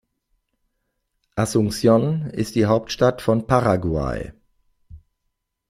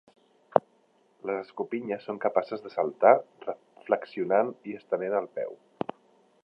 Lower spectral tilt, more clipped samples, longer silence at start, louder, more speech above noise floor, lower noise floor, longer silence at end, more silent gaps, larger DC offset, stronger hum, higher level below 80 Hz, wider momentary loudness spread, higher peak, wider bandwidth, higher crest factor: second, -6.5 dB/octave vs -8.5 dB/octave; neither; first, 1.35 s vs 0.55 s; first, -20 LUFS vs -29 LUFS; first, 56 dB vs 38 dB; first, -76 dBFS vs -66 dBFS; second, 0.75 s vs 0.9 s; neither; neither; neither; first, -44 dBFS vs -80 dBFS; second, 10 LU vs 16 LU; about the same, -2 dBFS vs -2 dBFS; first, 15.5 kHz vs 5.8 kHz; second, 20 dB vs 28 dB